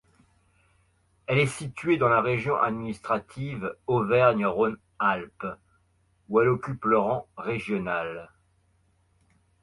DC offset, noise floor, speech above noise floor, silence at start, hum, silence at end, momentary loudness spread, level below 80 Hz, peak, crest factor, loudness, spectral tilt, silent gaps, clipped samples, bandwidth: under 0.1%; -67 dBFS; 41 dB; 1.3 s; none; 1.35 s; 14 LU; -60 dBFS; -8 dBFS; 20 dB; -26 LUFS; -6.5 dB/octave; none; under 0.1%; 11.5 kHz